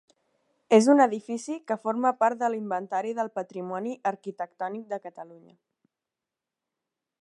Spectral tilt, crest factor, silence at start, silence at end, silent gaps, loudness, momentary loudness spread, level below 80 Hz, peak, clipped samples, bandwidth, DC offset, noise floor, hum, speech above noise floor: -5 dB/octave; 22 dB; 0.7 s; 1.85 s; none; -27 LUFS; 16 LU; -86 dBFS; -6 dBFS; under 0.1%; 11.5 kHz; under 0.1%; -89 dBFS; none; 62 dB